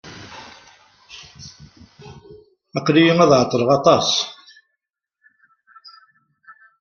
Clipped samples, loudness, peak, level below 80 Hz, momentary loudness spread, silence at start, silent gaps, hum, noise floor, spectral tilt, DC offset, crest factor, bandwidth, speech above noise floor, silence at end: under 0.1%; -16 LUFS; -2 dBFS; -58 dBFS; 26 LU; 0.05 s; none; none; -80 dBFS; -5 dB/octave; under 0.1%; 20 dB; 7.2 kHz; 64 dB; 2.5 s